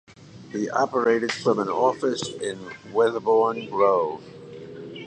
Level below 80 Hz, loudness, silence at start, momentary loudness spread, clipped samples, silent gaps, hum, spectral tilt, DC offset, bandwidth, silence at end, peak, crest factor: -66 dBFS; -23 LUFS; 0.1 s; 17 LU; under 0.1%; none; none; -4.5 dB/octave; under 0.1%; 9.2 kHz; 0 s; -6 dBFS; 18 dB